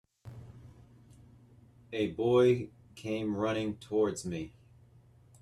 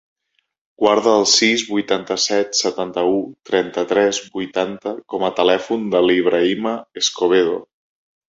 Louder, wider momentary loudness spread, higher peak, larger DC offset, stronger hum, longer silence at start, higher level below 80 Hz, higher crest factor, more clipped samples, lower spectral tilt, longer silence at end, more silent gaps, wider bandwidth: second, -31 LUFS vs -18 LUFS; first, 25 LU vs 9 LU; second, -14 dBFS vs 0 dBFS; neither; first, 60 Hz at -55 dBFS vs none; second, 0.25 s vs 0.8 s; about the same, -64 dBFS vs -60 dBFS; about the same, 20 dB vs 18 dB; neither; first, -6.5 dB/octave vs -2.5 dB/octave; first, 0.9 s vs 0.65 s; neither; first, 12.5 kHz vs 8.2 kHz